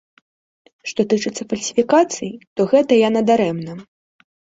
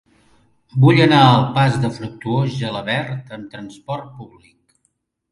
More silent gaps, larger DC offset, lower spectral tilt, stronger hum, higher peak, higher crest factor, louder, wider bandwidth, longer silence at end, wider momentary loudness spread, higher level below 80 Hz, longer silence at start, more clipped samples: first, 2.47-2.56 s vs none; neither; second, -5 dB/octave vs -7 dB/octave; neither; about the same, -2 dBFS vs 0 dBFS; about the same, 16 dB vs 18 dB; about the same, -18 LUFS vs -16 LUFS; second, 8 kHz vs 11 kHz; second, 0.65 s vs 1.05 s; second, 14 LU vs 22 LU; second, -62 dBFS vs -52 dBFS; about the same, 0.85 s vs 0.75 s; neither